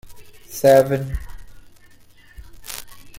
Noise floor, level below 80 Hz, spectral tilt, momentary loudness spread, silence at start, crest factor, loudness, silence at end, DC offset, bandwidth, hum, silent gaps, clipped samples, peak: -47 dBFS; -38 dBFS; -5.5 dB/octave; 21 LU; 0.05 s; 20 dB; -17 LUFS; 0 s; under 0.1%; 16.5 kHz; none; none; under 0.1%; -2 dBFS